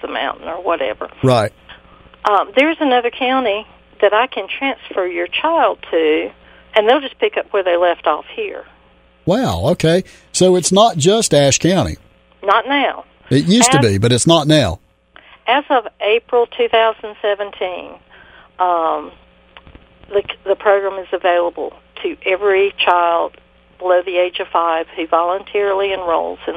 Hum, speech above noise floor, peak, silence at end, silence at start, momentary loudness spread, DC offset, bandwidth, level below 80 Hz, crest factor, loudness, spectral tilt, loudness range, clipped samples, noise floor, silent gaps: none; 35 dB; 0 dBFS; 0 s; 0.05 s; 12 LU; under 0.1%; 16 kHz; -46 dBFS; 16 dB; -16 LUFS; -4 dB/octave; 5 LU; under 0.1%; -50 dBFS; none